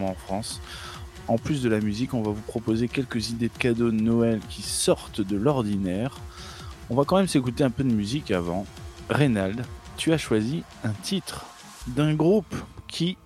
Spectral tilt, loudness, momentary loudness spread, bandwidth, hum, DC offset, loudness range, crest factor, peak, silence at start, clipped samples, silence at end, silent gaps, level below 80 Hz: -5.5 dB/octave; -26 LUFS; 15 LU; 15 kHz; none; under 0.1%; 2 LU; 20 dB; -6 dBFS; 0 s; under 0.1%; 0.1 s; none; -46 dBFS